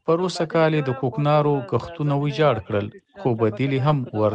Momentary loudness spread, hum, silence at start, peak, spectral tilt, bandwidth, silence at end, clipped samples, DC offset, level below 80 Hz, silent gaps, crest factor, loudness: 7 LU; none; 0.05 s; -6 dBFS; -7.5 dB/octave; 9 kHz; 0 s; under 0.1%; under 0.1%; -56 dBFS; none; 16 dB; -22 LUFS